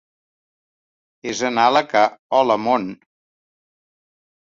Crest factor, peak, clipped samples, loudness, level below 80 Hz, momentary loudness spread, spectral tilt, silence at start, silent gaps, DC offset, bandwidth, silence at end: 20 dB; -2 dBFS; under 0.1%; -18 LUFS; -68 dBFS; 13 LU; -3.5 dB/octave; 1.25 s; 2.19-2.30 s; under 0.1%; 7.8 kHz; 1.45 s